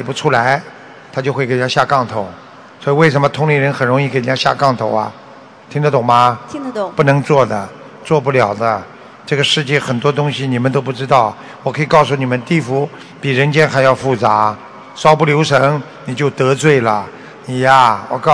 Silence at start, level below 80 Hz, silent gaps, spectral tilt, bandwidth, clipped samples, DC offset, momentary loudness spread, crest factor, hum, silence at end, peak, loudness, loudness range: 0 s; -54 dBFS; none; -5.5 dB/octave; 11 kHz; 0.6%; 0.1%; 13 LU; 14 dB; none; 0 s; 0 dBFS; -14 LUFS; 2 LU